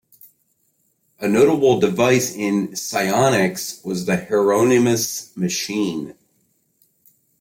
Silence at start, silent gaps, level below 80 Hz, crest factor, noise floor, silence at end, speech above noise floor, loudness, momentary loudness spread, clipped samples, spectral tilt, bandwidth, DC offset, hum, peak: 1.2 s; none; -60 dBFS; 16 dB; -66 dBFS; 1.3 s; 48 dB; -19 LUFS; 10 LU; under 0.1%; -4.5 dB/octave; 16.5 kHz; under 0.1%; none; -4 dBFS